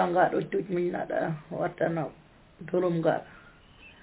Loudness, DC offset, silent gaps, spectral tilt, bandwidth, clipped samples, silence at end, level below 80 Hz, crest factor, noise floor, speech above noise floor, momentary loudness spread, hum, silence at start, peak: -29 LUFS; under 0.1%; none; -6.5 dB/octave; 4 kHz; under 0.1%; 0.15 s; -62 dBFS; 18 dB; -53 dBFS; 25 dB; 9 LU; none; 0 s; -12 dBFS